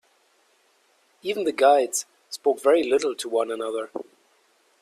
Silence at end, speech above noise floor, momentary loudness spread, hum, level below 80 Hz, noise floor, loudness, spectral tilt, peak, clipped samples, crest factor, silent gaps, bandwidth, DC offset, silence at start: 0.8 s; 41 dB; 16 LU; none; -74 dBFS; -64 dBFS; -23 LUFS; -2 dB/octave; -6 dBFS; under 0.1%; 20 dB; none; 15 kHz; under 0.1%; 1.25 s